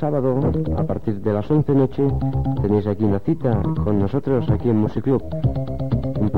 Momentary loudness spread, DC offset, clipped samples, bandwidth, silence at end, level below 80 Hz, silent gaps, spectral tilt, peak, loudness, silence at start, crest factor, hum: 4 LU; 2%; under 0.1%; 5 kHz; 0 s; -34 dBFS; none; -11 dB/octave; -6 dBFS; -21 LUFS; 0 s; 12 dB; none